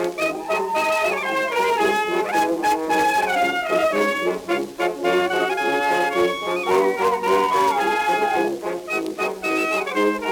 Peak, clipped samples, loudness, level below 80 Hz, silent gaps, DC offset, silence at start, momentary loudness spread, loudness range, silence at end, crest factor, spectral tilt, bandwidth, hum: -6 dBFS; under 0.1%; -20 LUFS; -58 dBFS; none; under 0.1%; 0 s; 5 LU; 1 LU; 0 s; 14 dB; -3.5 dB/octave; over 20 kHz; none